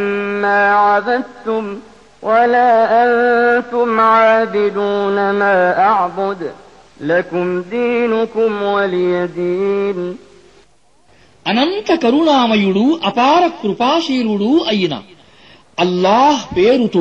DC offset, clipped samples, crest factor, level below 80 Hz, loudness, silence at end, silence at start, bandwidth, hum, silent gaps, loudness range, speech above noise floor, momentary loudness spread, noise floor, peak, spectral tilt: 0.2%; under 0.1%; 12 dB; -54 dBFS; -14 LUFS; 0 s; 0 s; 8.4 kHz; none; none; 5 LU; 40 dB; 10 LU; -54 dBFS; -2 dBFS; -5.5 dB/octave